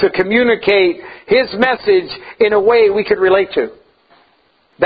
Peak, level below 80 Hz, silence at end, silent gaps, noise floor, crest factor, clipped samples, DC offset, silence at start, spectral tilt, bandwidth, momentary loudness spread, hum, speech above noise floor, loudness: 0 dBFS; -50 dBFS; 0 s; none; -56 dBFS; 14 dB; under 0.1%; under 0.1%; 0 s; -7.5 dB/octave; 5 kHz; 8 LU; none; 43 dB; -13 LUFS